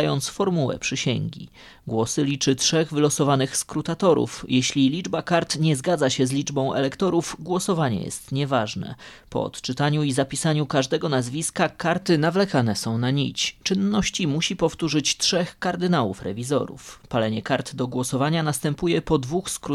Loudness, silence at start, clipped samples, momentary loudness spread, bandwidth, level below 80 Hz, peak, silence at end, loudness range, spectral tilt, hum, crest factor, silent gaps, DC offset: -23 LUFS; 0 s; under 0.1%; 8 LU; 13.5 kHz; -52 dBFS; -4 dBFS; 0 s; 3 LU; -4.5 dB/octave; none; 18 dB; none; under 0.1%